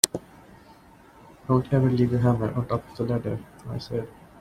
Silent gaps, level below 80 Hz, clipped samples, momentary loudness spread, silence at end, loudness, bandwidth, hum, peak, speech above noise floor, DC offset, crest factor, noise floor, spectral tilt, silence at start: none; -52 dBFS; under 0.1%; 15 LU; 0 s; -26 LUFS; 16 kHz; none; 0 dBFS; 27 dB; under 0.1%; 26 dB; -52 dBFS; -5.5 dB/octave; 0.05 s